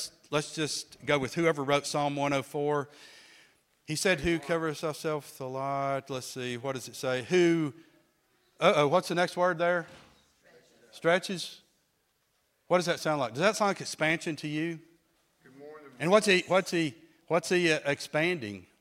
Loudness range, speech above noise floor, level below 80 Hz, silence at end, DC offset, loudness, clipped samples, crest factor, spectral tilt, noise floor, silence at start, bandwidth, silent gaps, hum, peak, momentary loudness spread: 4 LU; 45 dB; -64 dBFS; 0.2 s; under 0.1%; -29 LUFS; under 0.1%; 22 dB; -4.5 dB/octave; -74 dBFS; 0 s; 16 kHz; none; none; -8 dBFS; 11 LU